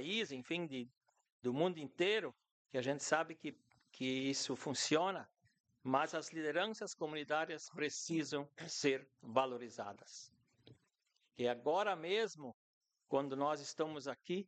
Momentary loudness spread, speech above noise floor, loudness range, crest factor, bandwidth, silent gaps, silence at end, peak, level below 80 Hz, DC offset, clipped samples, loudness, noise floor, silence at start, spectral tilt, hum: 13 LU; 43 dB; 3 LU; 22 dB; 9 kHz; 1.32-1.39 s, 2.51-2.65 s, 5.60-5.64 s, 12.54-12.81 s; 0.05 s; -18 dBFS; -88 dBFS; under 0.1%; under 0.1%; -40 LUFS; -82 dBFS; 0 s; -3.5 dB/octave; none